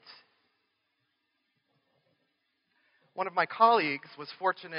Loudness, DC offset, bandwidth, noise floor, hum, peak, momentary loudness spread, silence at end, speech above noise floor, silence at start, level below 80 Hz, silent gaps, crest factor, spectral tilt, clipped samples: -28 LUFS; under 0.1%; 5.4 kHz; -79 dBFS; none; -8 dBFS; 18 LU; 0 s; 50 dB; 0.1 s; under -90 dBFS; none; 26 dB; -1.5 dB/octave; under 0.1%